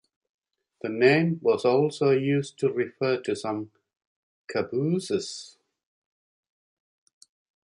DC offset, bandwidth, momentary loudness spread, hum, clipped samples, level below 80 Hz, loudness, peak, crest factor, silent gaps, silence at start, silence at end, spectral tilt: under 0.1%; 11 kHz; 13 LU; none; under 0.1%; -70 dBFS; -25 LUFS; -8 dBFS; 20 dB; 4.06-4.48 s; 0.85 s; 2.25 s; -6 dB/octave